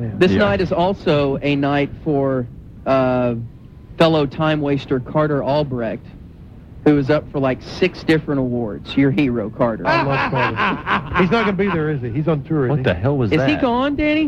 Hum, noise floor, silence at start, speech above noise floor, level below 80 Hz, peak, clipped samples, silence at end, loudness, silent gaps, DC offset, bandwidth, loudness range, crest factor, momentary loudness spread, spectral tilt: none; -39 dBFS; 0 s; 21 dB; -40 dBFS; -2 dBFS; under 0.1%; 0 s; -18 LUFS; none; under 0.1%; 8.8 kHz; 2 LU; 16 dB; 6 LU; -8 dB/octave